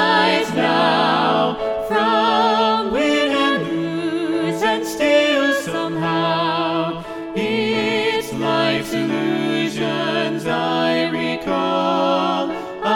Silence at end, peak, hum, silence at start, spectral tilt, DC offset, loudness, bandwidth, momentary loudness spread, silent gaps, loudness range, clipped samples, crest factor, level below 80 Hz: 0 s; -2 dBFS; none; 0 s; -5 dB/octave; under 0.1%; -19 LUFS; 17.5 kHz; 6 LU; none; 3 LU; under 0.1%; 16 dB; -54 dBFS